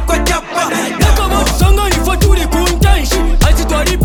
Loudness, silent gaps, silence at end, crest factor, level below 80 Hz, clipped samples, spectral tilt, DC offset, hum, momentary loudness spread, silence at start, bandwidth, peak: -13 LUFS; none; 0 s; 10 dB; -14 dBFS; under 0.1%; -4.5 dB/octave; under 0.1%; none; 4 LU; 0 s; 18 kHz; 0 dBFS